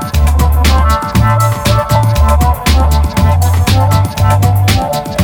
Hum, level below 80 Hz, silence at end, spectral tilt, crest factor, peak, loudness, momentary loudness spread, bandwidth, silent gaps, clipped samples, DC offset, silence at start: none; -14 dBFS; 0 s; -5.5 dB/octave; 10 dB; 0 dBFS; -11 LUFS; 2 LU; 19 kHz; none; under 0.1%; under 0.1%; 0 s